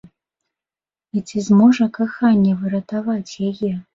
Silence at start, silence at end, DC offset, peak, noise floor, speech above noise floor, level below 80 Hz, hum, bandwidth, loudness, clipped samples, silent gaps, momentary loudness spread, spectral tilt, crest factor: 1.15 s; 0.15 s; under 0.1%; -4 dBFS; under -90 dBFS; over 73 dB; -58 dBFS; none; 7.6 kHz; -18 LUFS; under 0.1%; none; 12 LU; -7 dB/octave; 16 dB